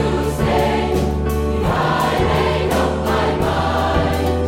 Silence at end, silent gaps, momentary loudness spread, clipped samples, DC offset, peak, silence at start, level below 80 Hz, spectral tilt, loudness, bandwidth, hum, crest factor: 0 s; none; 2 LU; under 0.1%; under 0.1%; -4 dBFS; 0 s; -26 dBFS; -6 dB/octave; -18 LUFS; 16.5 kHz; none; 12 dB